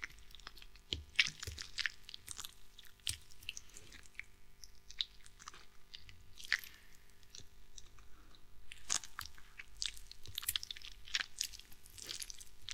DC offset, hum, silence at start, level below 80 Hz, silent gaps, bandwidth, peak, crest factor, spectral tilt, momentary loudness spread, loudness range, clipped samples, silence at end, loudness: under 0.1%; 50 Hz at -75 dBFS; 0 s; -62 dBFS; none; 17.5 kHz; -8 dBFS; 36 dB; 0.5 dB/octave; 20 LU; 7 LU; under 0.1%; 0 s; -42 LUFS